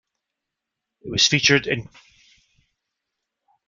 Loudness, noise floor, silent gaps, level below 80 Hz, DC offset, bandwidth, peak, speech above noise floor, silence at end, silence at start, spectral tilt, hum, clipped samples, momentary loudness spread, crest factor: -18 LUFS; -84 dBFS; none; -56 dBFS; under 0.1%; 11 kHz; -2 dBFS; 63 dB; 1.85 s; 1.05 s; -2.5 dB/octave; none; under 0.1%; 12 LU; 24 dB